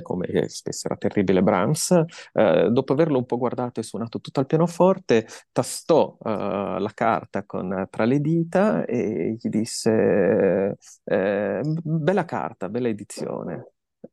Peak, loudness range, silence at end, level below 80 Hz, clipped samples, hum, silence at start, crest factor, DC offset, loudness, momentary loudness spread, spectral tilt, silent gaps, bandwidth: -4 dBFS; 3 LU; 0.5 s; -64 dBFS; under 0.1%; none; 0 s; 18 dB; under 0.1%; -23 LUFS; 10 LU; -6 dB/octave; none; 12.5 kHz